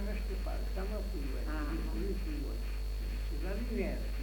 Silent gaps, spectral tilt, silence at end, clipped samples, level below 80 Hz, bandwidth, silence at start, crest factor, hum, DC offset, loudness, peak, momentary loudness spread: none; -6.5 dB/octave; 0 s; under 0.1%; -36 dBFS; 19 kHz; 0 s; 12 dB; none; under 0.1%; -39 LUFS; -24 dBFS; 3 LU